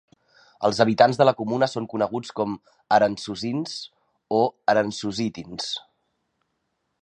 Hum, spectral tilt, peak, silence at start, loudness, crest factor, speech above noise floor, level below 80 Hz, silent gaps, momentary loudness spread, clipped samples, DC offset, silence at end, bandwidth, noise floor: none; -5 dB/octave; -2 dBFS; 0.6 s; -23 LUFS; 22 dB; 53 dB; -64 dBFS; none; 13 LU; under 0.1%; under 0.1%; 1.2 s; 10.5 kHz; -76 dBFS